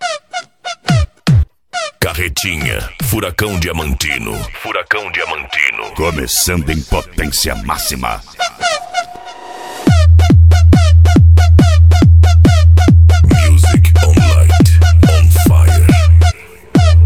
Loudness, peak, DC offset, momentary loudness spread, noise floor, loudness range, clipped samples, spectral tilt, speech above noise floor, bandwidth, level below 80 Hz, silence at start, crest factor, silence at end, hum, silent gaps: -11 LUFS; 0 dBFS; 0.4%; 14 LU; -30 dBFS; 9 LU; under 0.1%; -5.5 dB/octave; 13 dB; 16 kHz; -14 dBFS; 0 s; 8 dB; 0 s; none; none